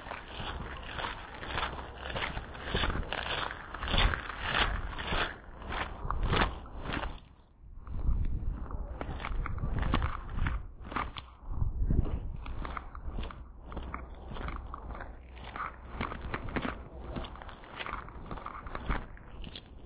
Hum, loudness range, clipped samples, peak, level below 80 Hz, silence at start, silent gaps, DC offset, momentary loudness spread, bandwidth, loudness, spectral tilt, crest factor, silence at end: none; 9 LU; under 0.1%; -12 dBFS; -38 dBFS; 0 s; none; under 0.1%; 13 LU; 4 kHz; -37 LUFS; -3.5 dB/octave; 22 dB; 0 s